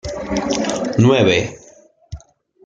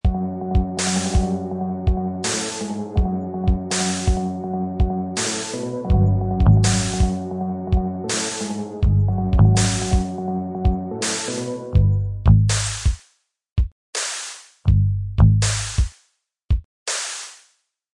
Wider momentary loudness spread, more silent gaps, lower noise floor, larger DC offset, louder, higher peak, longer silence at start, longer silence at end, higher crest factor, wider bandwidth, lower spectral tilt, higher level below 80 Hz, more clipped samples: first, 25 LU vs 10 LU; second, none vs 13.52-13.56 s, 13.72-13.93 s, 16.44-16.48 s, 16.65-16.86 s; second, -48 dBFS vs -66 dBFS; neither; first, -16 LUFS vs -21 LUFS; about the same, -2 dBFS vs -2 dBFS; about the same, 0.05 s vs 0.05 s; second, 0.45 s vs 0.6 s; about the same, 16 dB vs 18 dB; second, 9.2 kHz vs 11.5 kHz; about the same, -5.5 dB/octave vs -5 dB/octave; second, -42 dBFS vs -26 dBFS; neither